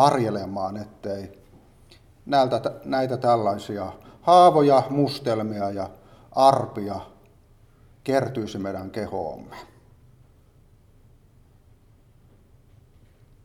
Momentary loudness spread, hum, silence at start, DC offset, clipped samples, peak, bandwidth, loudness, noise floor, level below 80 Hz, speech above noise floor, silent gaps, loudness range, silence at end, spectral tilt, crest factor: 17 LU; none; 0 s; under 0.1%; under 0.1%; -2 dBFS; 14.5 kHz; -23 LUFS; -55 dBFS; -58 dBFS; 33 dB; none; 14 LU; 3.8 s; -6.5 dB/octave; 22 dB